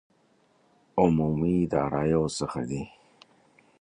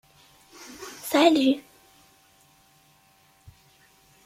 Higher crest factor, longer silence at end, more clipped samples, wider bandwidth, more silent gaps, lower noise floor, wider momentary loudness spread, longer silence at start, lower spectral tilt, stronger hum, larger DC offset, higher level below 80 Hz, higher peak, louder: about the same, 20 dB vs 22 dB; second, 0.9 s vs 2.65 s; neither; second, 10.5 kHz vs 16 kHz; neither; first, -65 dBFS vs -60 dBFS; second, 11 LU vs 25 LU; first, 0.95 s vs 0.8 s; first, -7 dB/octave vs -3 dB/octave; neither; neither; first, -50 dBFS vs -70 dBFS; about the same, -8 dBFS vs -6 dBFS; second, -27 LUFS vs -22 LUFS